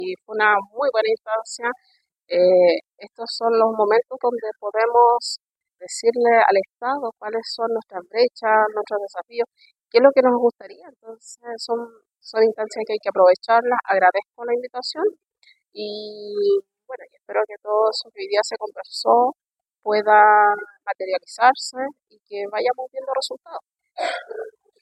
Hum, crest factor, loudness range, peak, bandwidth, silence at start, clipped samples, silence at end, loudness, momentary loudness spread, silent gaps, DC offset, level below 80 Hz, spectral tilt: none; 20 dB; 5 LU; 0 dBFS; 12 kHz; 0 s; under 0.1%; 0.35 s; -20 LUFS; 17 LU; none; under 0.1%; -78 dBFS; -3 dB/octave